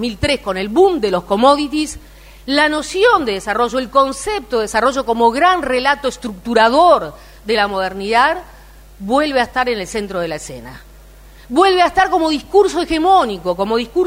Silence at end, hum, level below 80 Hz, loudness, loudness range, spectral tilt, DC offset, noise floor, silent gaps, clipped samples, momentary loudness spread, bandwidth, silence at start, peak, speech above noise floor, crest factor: 0 s; none; -40 dBFS; -15 LUFS; 4 LU; -4 dB/octave; under 0.1%; -40 dBFS; none; under 0.1%; 10 LU; 16 kHz; 0 s; 0 dBFS; 25 dB; 16 dB